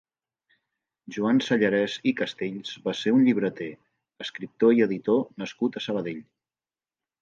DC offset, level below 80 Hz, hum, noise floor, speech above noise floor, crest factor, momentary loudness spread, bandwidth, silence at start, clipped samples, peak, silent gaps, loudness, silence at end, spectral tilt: under 0.1%; -72 dBFS; none; under -90 dBFS; over 65 dB; 18 dB; 16 LU; 7.4 kHz; 1.1 s; under 0.1%; -8 dBFS; none; -25 LUFS; 1 s; -6 dB/octave